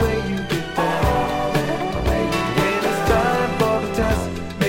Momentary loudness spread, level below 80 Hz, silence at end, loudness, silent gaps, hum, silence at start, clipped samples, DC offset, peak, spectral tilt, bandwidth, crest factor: 5 LU; -32 dBFS; 0 s; -20 LUFS; none; none; 0 s; under 0.1%; under 0.1%; -4 dBFS; -5.5 dB/octave; 16.5 kHz; 16 dB